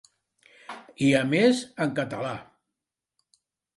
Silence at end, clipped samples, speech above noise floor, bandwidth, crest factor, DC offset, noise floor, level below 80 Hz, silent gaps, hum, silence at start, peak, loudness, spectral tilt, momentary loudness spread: 1.35 s; under 0.1%; 63 dB; 11.5 kHz; 20 dB; under 0.1%; -87 dBFS; -68 dBFS; none; none; 0.7 s; -8 dBFS; -25 LUFS; -5.5 dB/octave; 21 LU